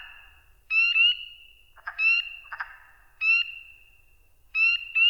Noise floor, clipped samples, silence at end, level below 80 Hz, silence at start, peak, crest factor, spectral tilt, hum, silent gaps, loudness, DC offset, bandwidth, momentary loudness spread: -59 dBFS; under 0.1%; 0 s; -62 dBFS; 0 s; -12 dBFS; 14 dB; 2 dB/octave; none; none; -22 LUFS; under 0.1%; over 20 kHz; 20 LU